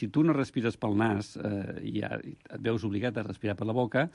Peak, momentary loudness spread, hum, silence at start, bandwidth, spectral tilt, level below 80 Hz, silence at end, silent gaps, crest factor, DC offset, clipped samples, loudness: -14 dBFS; 9 LU; none; 0 s; 11 kHz; -7.5 dB/octave; -58 dBFS; 0.05 s; none; 16 dB; under 0.1%; under 0.1%; -31 LUFS